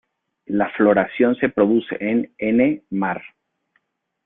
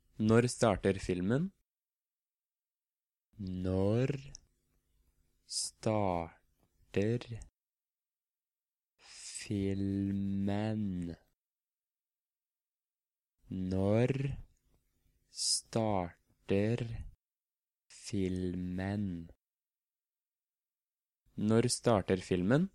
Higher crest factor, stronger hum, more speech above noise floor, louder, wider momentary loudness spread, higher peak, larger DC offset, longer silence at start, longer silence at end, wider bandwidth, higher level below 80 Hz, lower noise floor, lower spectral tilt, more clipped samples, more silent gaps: about the same, 18 dB vs 22 dB; neither; second, 50 dB vs over 57 dB; first, -20 LUFS vs -34 LUFS; second, 7 LU vs 16 LU; first, -2 dBFS vs -14 dBFS; neither; first, 0.5 s vs 0.2 s; first, 1 s vs 0.05 s; second, 3.9 kHz vs 13 kHz; about the same, -60 dBFS vs -60 dBFS; second, -68 dBFS vs under -90 dBFS; first, -11 dB/octave vs -5.5 dB/octave; neither; second, none vs 20.27-20.31 s